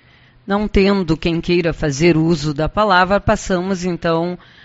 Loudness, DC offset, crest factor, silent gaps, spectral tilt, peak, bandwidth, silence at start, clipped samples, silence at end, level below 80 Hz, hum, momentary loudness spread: -17 LUFS; under 0.1%; 16 dB; none; -5 dB/octave; 0 dBFS; 8 kHz; 0.45 s; under 0.1%; 0.3 s; -32 dBFS; none; 7 LU